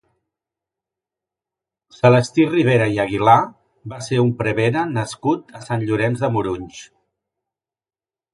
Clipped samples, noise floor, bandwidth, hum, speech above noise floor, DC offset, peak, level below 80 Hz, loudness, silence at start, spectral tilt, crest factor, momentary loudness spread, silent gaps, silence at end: under 0.1%; under -90 dBFS; 11.5 kHz; none; over 72 dB; under 0.1%; 0 dBFS; -54 dBFS; -18 LUFS; 2.05 s; -6.5 dB/octave; 20 dB; 13 LU; none; 1.5 s